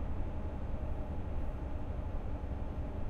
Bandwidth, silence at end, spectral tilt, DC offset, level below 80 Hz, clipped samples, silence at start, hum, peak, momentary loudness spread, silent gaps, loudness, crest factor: 4.5 kHz; 0 s; -9 dB/octave; under 0.1%; -38 dBFS; under 0.1%; 0 s; none; -24 dBFS; 1 LU; none; -41 LUFS; 12 dB